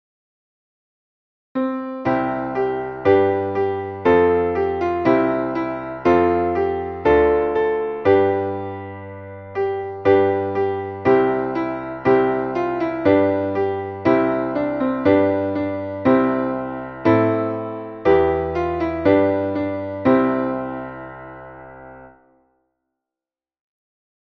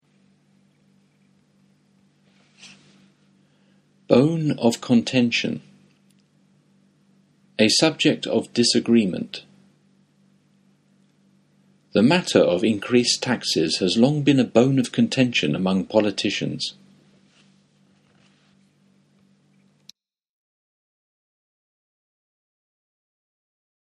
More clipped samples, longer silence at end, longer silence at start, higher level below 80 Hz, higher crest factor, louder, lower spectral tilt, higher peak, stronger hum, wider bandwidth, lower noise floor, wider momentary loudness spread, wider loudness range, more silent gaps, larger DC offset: neither; second, 2.3 s vs 7.25 s; second, 1.55 s vs 2.65 s; first, -46 dBFS vs -66 dBFS; second, 18 dB vs 24 dB; about the same, -19 LUFS vs -20 LUFS; first, -9 dB/octave vs -4.5 dB/octave; about the same, -2 dBFS vs 0 dBFS; neither; second, 6.2 kHz vs 12 kHz; first, under -90 dBFS vs -61 dBFS; first, 12 LU vs 9 LU; second, 4 LU vs 8 LU; neither; neither